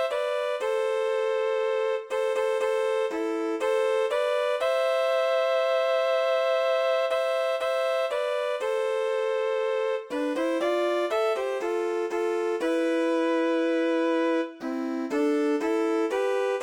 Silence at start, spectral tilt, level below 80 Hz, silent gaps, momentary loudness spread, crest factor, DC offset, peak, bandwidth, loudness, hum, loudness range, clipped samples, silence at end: 0 s; -2.5 dB/octave; -74 dBFS; none; 4 LU; 10 dB; under 0.1%; -16 dBFS; 15.5 kHz; -26 LUFS; none; 2 LU; under 0.1%; 0 s